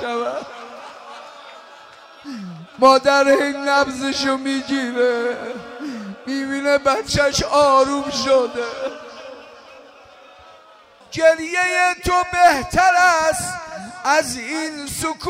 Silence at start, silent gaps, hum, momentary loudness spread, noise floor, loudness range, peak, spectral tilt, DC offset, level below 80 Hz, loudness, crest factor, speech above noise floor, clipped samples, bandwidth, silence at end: 0 s; none; none; 21 LU; -48 dBFS; 5 LU; -2 dBFS; -3 dB/octave; under 0.1%; -46 dBFS; -18 LUFS; 18 dB; 30 dB; under 0.1%; 16 kHz; 0 s